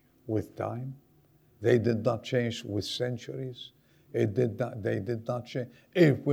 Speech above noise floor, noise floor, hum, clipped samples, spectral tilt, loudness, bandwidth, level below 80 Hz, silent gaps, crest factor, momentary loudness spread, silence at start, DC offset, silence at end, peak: 34 dB; -63 dBFS; none; under 0.1%; -7 dB/octave; -30 LUFS; 15.5 kHz; -68 dBFS; none; 20 dB; 14 LU; 0.25 s; under 0.1%; 0 s; -10 dBFS